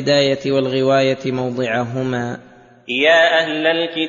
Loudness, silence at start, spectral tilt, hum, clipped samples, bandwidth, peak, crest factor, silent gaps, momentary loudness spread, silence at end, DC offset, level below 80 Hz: -17 LUFS; 0 s; -5 dB/octave; none; under 0.1%; 7.4 kHz; -2 dBFS; 16 dB; none; 11 LU; 0 s; under 0.1%; -58 dBFS